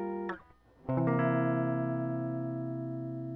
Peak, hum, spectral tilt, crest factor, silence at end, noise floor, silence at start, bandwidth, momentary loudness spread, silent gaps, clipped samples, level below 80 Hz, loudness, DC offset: -16 dBFS; none; -11.5 dB/octave; 16 dB; 0 s; -58 dBFS; 0 s; 3.7 kHz; 10 LU; none; under 0.1%; -64 dBFS; -33 LUFS; under 0.1%